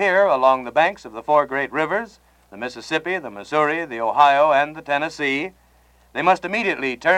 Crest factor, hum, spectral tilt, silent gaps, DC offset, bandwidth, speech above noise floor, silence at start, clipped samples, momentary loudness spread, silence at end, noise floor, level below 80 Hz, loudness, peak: 18 dB; none; -4.5 dB/octave; none; under 0.1%; 11.5 kHz; 35 dB; 0 s; under 0.1%; 15 LU; 0 s; -55 dBFS; -58 dBFS; -20 LUFS; -2 dBFS